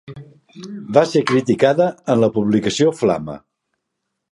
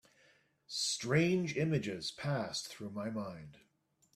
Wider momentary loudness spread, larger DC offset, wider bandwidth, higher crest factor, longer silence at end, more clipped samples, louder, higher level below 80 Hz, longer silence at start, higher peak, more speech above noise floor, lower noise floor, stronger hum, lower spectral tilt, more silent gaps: first, 18 LU vs 13 LU; neither; second, 11.5 kHz vs 14 kHz; about the same, 18 dB vs 20 dB; first, 0.95 s vs 0.6 s; neither; first, -17 LUFS vs -36 LUFS; first, -56 dBFS vs -70 dBFS; second, 0.1 s vs 0.7 s; first, 0 dBFS vs -16 dBFS; first, 60 dB vs 39 dB; about the same, -77 dBFS vs -74 dBFS; neither; first, -6 dB/octave vs -4.5 dB/octave; neither